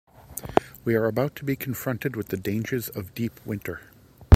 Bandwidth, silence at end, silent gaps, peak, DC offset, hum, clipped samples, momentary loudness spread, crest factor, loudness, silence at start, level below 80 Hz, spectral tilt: 16.5 kHz; 0 s; none; 0 dBFS; under 0.1%; none; under 0.1%; 10 LU; 24 dB; -28 LUFS; 0.3 s; -54 dBFS; -7 dB/octave